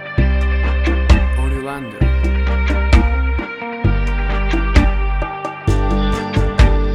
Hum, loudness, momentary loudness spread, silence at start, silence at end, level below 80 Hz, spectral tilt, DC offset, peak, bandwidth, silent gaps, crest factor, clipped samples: none; -17 LUFS; 7 LU; 0 s; 0 s; -16 dBFS; -7 dB/octave; under 0.1%; 0 dBFS; 9.2 kHz; none; 14 dB; under 0.1%